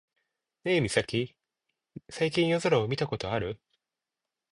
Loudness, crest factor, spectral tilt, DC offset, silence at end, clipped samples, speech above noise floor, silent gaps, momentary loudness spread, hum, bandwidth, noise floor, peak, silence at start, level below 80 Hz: -29 LUFS; 22 dB; -5.5 dB/octave; under 0.1%; 0.95 s; under 0.1%; 60 dB; none; 12 LU; none; 11.5 kHz; -88 dBFS; -10 dBFS; 0.65 s; -58 dBFS